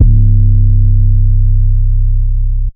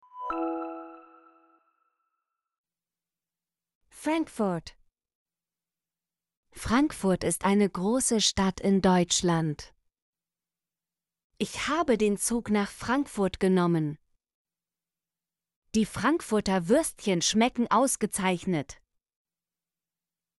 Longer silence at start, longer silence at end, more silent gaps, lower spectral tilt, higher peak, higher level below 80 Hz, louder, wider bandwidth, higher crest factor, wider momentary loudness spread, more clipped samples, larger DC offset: second, 0 s vs 0.15 s; second, 0.05 s vs 1.65 s; second, none vs 2.58-2.64 s, 3.75-3.81 s, 5.15-5.26 s, 6.37-6.43 s, 10.02-10.13 s, 11.24-11.30 s, 14.34-14.45 s, 15.56-15.62 s; first, -16 dB/octave vs -4.5 dB/octave; first, 0 dBFS vs -10 dBFS; first, -8 dBFS vs -54 dBFS; first, -12 LUFS vs -27 LUFS; second, 0.5 kHz vs 12 kHz; second, 8 dB vs 20 dB; second, 6 LU vs 11 LU; first, 0.2% vs under 0.1%; neither